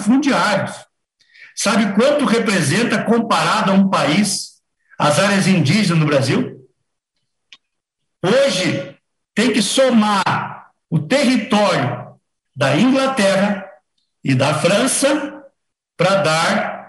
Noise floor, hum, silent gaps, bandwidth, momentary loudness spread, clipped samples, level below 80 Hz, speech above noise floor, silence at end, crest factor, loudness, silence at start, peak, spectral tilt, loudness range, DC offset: -76 dBFS; none; none; 12.5 kHz; 9 LU; under 0.1%; -60 dBFS; 61 dB; 0 s; 14 dB; -16 LUFS; 0 s; -2 dBFS; -4.5 dB/octave; 3 LU; under 0.1%